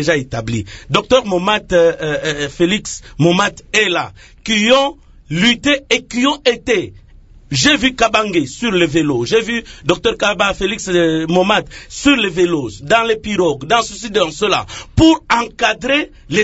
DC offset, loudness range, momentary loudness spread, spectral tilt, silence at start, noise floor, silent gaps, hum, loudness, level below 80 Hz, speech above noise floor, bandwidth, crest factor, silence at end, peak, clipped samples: under 0.1%; 1 LU; 8 LU; -4 dB/octave; 0 s; -42 dBFS; none; none; -15 LUFS; -38 dBFS; 26 dB; 8 kHz; 16 dB; 0 s; 0 dBFS; under 0.1%